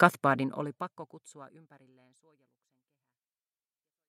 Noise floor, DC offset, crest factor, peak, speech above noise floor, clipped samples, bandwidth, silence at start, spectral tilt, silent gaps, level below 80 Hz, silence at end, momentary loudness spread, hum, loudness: under -90 dBFS; under 0.1%; 30 dB; -4 dBFS; over 58 dB; under 0.1%; 14.5 kHz; 0 s; -6 dB/octave; none; -82 dBFS; 2.6 s; 24 LU; none; -30 LUFS